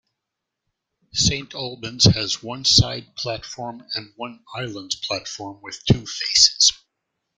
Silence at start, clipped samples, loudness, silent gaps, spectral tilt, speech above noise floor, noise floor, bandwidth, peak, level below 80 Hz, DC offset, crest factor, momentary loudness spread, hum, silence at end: 1.15 s; under 0.1%; -19 LUFS; none; -3 dB/octave; 60 dB; -82 dBFS; 12 kHz; 0 dBFS; -44 dBFS; under 0.1%; 24 dB; 18 LU; none; 0.65 s